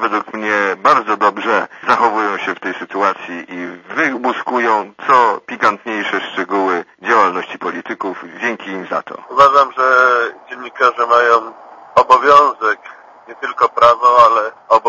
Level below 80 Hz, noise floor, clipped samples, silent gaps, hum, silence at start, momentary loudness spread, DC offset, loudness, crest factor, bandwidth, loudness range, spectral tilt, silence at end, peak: -60 dBFS; -38 dBFS; 0.2%; none; none; 0 s; 14 LU; under 0.1%; -14 LUFS; 14 dB; 9.6 kHz; 5 LU; -4 dB/octave; 0 s; 0 dBFS